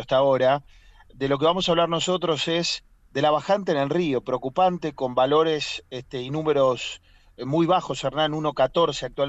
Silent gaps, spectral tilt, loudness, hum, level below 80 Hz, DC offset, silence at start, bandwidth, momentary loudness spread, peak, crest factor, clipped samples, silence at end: none; -5 dB/octave; -23 LUFS; none; -54 dBFS; under 0.1%; 0 s; 8.2 kHz; 10 LU; -8 dBFS; 14 dB; under 0.1%; 0 s